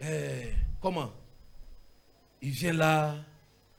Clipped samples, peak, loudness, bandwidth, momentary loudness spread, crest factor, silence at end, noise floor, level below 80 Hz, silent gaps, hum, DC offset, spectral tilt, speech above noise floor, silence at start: under 0.1%; -12 dBFS; -31 LUFS; 17 kHz; 15 LU; 22 dB; 0.5 s; -61 dBFS; -40 dBFS; none; none; under 0.1%; -5.5 dB/octave; 32 dB; 0 s